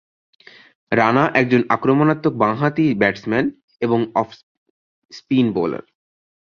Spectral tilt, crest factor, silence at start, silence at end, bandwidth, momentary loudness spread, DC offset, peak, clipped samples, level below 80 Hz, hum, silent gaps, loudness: -8 dB/octave; 18 dB; 0.9 s; 0.7 s; 6.8 kHz; 9 LU; under 0.1%; 0 dBFS; under 0.1%; -58 dBFS; none; 3.63-3.68 s, 4.43-5.09 s; -18 LUFS